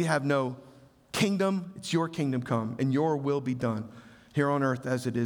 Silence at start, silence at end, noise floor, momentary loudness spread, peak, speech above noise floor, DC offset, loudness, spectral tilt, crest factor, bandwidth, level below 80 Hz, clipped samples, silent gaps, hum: 0 s; 0 s; -53 dBFS; 9 LU; -10 dBFS; 25 dB; under 0.1%; -29 LUFS; -6 dB/octave; 18 dB; over 20 kHz; -68 dBFS; under 0.1%; none; none